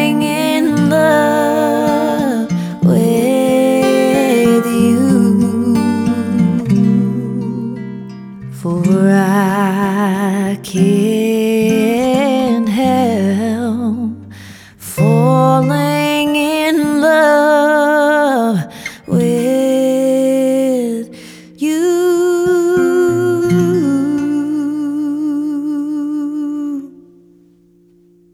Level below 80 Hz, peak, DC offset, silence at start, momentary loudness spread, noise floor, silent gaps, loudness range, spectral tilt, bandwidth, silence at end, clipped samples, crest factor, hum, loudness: -52 dBFS; 0 dBFS; under 0.1%; 0 s; 9 LU; -49 dBFS; none; 4 LU; -6.5 dB/octave; 18.5 kHz; 1.45 s; under 0.1%; 12 dB; none; -14 LUFS